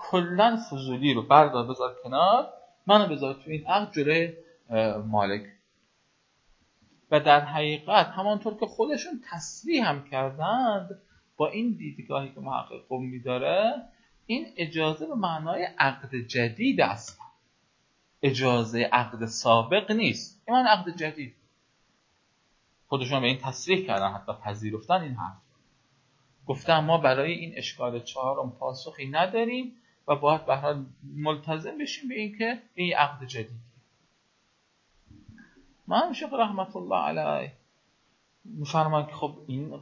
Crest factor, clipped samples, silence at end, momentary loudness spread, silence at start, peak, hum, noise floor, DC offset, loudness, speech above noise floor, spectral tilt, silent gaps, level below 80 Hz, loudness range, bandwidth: 26 dB; under 0.1%; 0 s; 14 LU; 0 s; -2 dBFS; none; -69 dBFS; under 0.1%; -27 LUFS; 43 dB; -5 dB/octave; none; -68 dBFS; 6 LU; 7.8 kHz